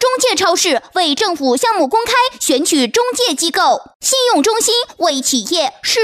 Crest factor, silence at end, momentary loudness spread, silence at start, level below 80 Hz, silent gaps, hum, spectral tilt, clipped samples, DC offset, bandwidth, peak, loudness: 12 dB; 0 s; 3 LU; 0 s; -56 dBFS; 3.95-4.00 s; none; -0.5 dB/octave; under 0.1%; under 0.1%; 16 kHz; -2 dBFS; -14 LUFS